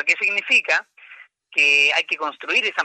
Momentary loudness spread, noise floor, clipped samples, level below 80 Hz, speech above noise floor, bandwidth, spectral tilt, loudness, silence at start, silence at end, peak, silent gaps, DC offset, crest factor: 11 LU; -46 dBFS; under 0.1%; -80 dBFS; 27 dB; 9.6 kHz; 0.5 dB/octave; -17 LUFS; 0 s; 0 s; -4 dBFS; none; under 0.1%; 16 dB